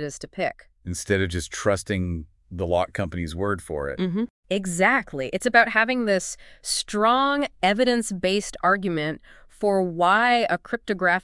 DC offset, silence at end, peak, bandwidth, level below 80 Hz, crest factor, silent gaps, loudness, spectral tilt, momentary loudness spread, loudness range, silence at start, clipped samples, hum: under 0.1%; 0.05 s; -2 dBFS; 12 kHz; -50 dBFS; 22 dB; 4.30-4.43 s; -23 LUFS; -4 dB/octave; 12 LU; 5 LU; 0 s; under 0.1%; none